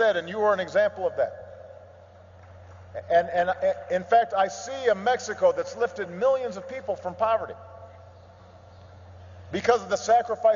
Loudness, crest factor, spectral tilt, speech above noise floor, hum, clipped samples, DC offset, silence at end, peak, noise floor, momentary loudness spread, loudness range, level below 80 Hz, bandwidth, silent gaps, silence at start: -25 LUFS; 20 dB; -4 dB/octave; 25 dB; none; under 0.1%; under 0.1%; 0 s; -6 dBFS; -49 dBFS; 18 LU; 5 LU; -66 dBFS; 7.6 kHz; none; 0 s